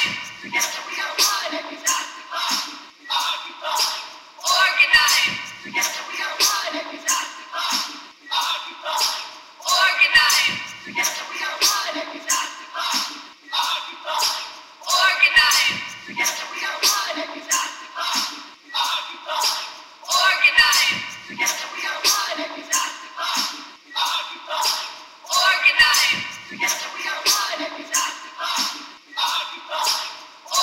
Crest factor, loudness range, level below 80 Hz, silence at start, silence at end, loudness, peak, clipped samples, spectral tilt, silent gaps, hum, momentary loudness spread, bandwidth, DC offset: 20 dB; 5 LU; -60 dBFS; 0 s; 0 s; -20 LUFS; -2 dBFS; under 0.1%; 1.5 dB/octave; none; none; 16 LU; 16 kHz; under 0.1%